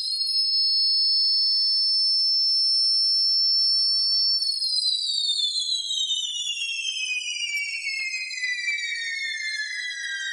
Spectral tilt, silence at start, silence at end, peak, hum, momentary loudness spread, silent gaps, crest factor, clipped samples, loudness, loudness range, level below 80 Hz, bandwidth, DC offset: 7 dB/octave; 0 s; 0 s; -12 dBFS; none; 9 LU; none; 12 dB; under 0.1%; -21 LUFS; 8 LU; -86 dBFS; 12 kHz; under 0.1%